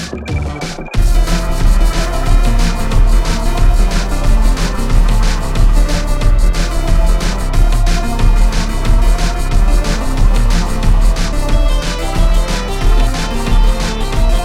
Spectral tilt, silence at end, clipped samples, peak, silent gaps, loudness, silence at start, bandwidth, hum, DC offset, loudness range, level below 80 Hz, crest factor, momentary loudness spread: -5 dB/octave; 0 s; under 0.1%; -2 dBFS; none; -16 LUFS; 0 s; 13 kHz; none; under 0.1%; 1 LU; -12 dBFS; 10 dB; 3 LU